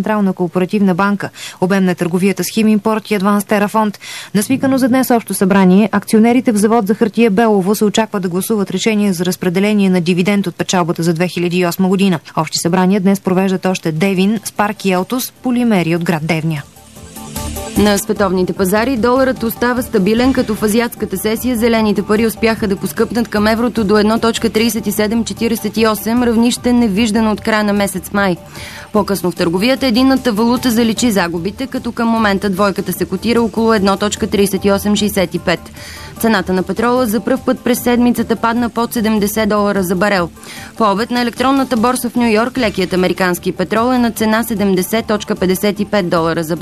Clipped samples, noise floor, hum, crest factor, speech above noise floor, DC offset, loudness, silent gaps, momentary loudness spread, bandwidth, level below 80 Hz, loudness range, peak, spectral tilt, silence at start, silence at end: under 0.1%; -33 dBFS; none; 14 dB; 20 dB; 0.2%; -14 LUFS; none; 5 LU; 14 kHz; -40 dBFS; 3 LU; 0 dBFS; -5.5 dB/octave; 0 s; 0 s